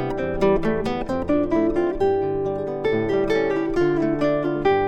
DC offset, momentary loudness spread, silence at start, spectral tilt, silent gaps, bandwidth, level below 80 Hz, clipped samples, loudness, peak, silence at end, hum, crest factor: under 0.1%; 5 LU; 0 s; -7.5 dB/octave; none; 9 kHz; -40 dBFS; under 0.1%; -22 LUFS; -6 dBFS; 0 s; none; 14 dB